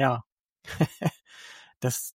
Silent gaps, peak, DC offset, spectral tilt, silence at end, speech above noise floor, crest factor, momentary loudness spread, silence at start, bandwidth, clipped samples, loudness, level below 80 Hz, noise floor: 0.26-0.56 s, 1.76-1.80 s; -8 dBFS; under 0.1%; -5 dB/octave; 0.05 s; 22 dB; 22 dB; 20 LU; 0 s; 16 kHz; under 0.1%; -30 LUFS; -62 dBFS; -50 dBFS